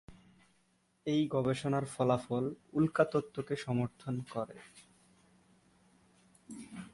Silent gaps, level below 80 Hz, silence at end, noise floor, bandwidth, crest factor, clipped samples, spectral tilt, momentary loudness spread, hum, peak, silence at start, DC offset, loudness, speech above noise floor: none; -68 dBFS; 0.05 s; -73 dBFS; 11.5 kHz; 22 dB; under 0.1%; -7 dB/octave; 17 LU; none; -14 dBFS; 0.1 s; under 0.1%; -34 LUFS; 40 dB